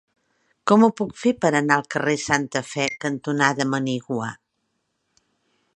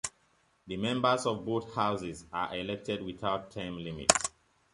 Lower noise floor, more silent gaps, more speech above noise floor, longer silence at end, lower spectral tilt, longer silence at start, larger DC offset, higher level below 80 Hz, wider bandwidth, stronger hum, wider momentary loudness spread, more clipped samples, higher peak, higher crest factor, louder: first, -74 dBFS vs -70 dBFS; neither; first, 53 dB vs 38 dB; first, 1.4 s vs 0.45 s; first, -5 dB/octave vs -3 dB/octave; first, 0.65 s vs 0.05 s; neither; about the same, -64 dBFS vs -60 dBFS; about the same, 10.5 kHz vs 11.5 kHz; neither; about the same, 11 LU vs 12 LU; neither; about the same, -2 dBFS vs -2 dBFS; second, 22 dB vs 32 dB; first, -22 LUFS vs -32 LUFS